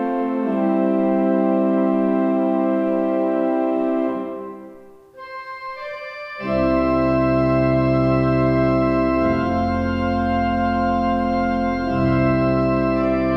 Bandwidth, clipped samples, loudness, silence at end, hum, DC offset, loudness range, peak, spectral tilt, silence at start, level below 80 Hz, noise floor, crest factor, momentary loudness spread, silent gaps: 6 kHz; under 0.1%; -19 LUFS; 0 s; none; under 0.1%; 6 LU; -6 dBFS; -9.5 dB/octave; 0 s; -38 dBFS; -43 dBFS; 12 dB; 13 LU; none